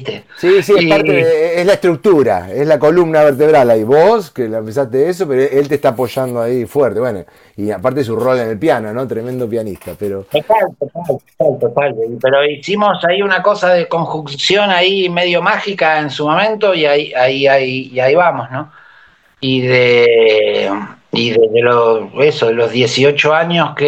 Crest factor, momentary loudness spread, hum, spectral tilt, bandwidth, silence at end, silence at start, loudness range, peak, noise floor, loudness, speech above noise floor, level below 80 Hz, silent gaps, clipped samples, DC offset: 12 dB; 10 LU; none; -5.5 dB/octave; 16.5 kHz; 0 s; 0 s; 6 LU; 0 dBFS; -47 dBFS; -13 LUFS; 34 dB; -54 dBFS; none; under 0.1%; under 0.1%